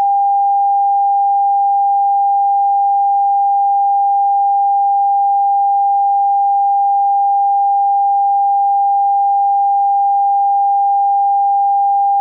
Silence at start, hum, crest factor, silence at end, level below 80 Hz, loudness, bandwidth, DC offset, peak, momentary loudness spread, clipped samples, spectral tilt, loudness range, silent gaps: 0 s; none; 4 dB; 0 s; under -90 dBFS; -13 LUFS; 1 kHz; under 0.1%; -10 dBFS; 0 LU; under 0.1%; -3 dB/octave; 0 LU; none